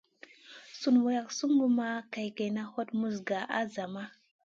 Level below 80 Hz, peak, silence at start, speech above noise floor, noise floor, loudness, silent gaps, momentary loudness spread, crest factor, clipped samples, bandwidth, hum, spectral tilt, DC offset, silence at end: -80 dBFS; -14 dBFS; 0.5 s; 25 dB; -55 dBFS; -31 LUFS; none; 17 LU; 18 dB; under 0.1%; 7.6 kHz; none; -5 dB/octave; under 0.1%; 0.4 s